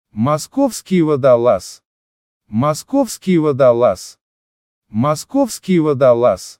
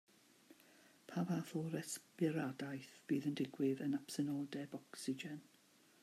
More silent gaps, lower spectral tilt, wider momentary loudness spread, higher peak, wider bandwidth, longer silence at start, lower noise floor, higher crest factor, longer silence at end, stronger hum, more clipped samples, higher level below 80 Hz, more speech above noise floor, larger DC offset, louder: first, 1.85-2.40 s, 4.21-4.82 s vs none; about the same, -6.5 dB/octave vs -5.5 dB/octave; about the same, 8 LU vs 10 LU; first, 0 dBFS vs -26 dBFS; about the same, 16.5 kHz vs 15 kHz; second, 0.15 s vs 0.5 s; first, under -90 dBFS vs -70 dBFS; about the same, 16 dB vs 18 dB; second, 0.05 s vs 0.6 s; neither; neither; first, -54 dBFS vs -88 dBFS; first, over 75 dB vs 28 dB; neither; first, -15 LUFS vs -43 LUFS